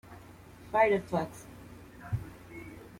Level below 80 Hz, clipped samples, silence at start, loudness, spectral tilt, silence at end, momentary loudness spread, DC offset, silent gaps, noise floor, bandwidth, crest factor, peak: -58 dBFS; under 0.1%; 0.1 s; -31 LUFS; -6.5 dB/octave; 0.1 s; 25 LU; under 0.1%; none; -51 dBFS; 16.5 kHz; 22 dB; -12 dBFS